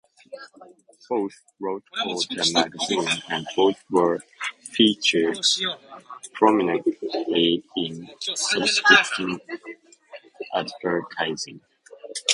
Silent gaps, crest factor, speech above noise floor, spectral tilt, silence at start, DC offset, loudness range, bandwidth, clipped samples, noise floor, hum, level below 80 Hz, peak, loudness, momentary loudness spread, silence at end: none; 24 dB; 23 dB; -2.5 dB/octave; 0.3 s; under 0.1%; 5 LU; 11.5 kHz; under 0.1%; -47 dBFS; none; -68 dBFS; 0 dBFS; -22 LUFS; 18 LU; 0 s